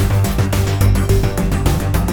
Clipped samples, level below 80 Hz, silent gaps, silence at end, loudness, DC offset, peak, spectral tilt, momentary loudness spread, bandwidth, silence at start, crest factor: under 0.1%; -20 dBFS; none; 0 s; -16 LUFS; 0.9%; -2 dBFS; -6 dB/octave; 3 LU; over 20 kHz; 0 s; 14 dB